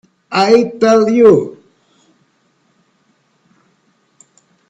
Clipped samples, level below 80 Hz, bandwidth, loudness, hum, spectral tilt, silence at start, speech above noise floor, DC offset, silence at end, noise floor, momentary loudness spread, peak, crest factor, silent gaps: under 0.1%; -58 dBFS; 8 kHz; -11 LUFS; none; -5.5 dB/octave; 0.3 s; 49 dB; under 0.1%; 3.15 s; -59 dBFS; 9 LU; 0 dBFS; 16 dB; none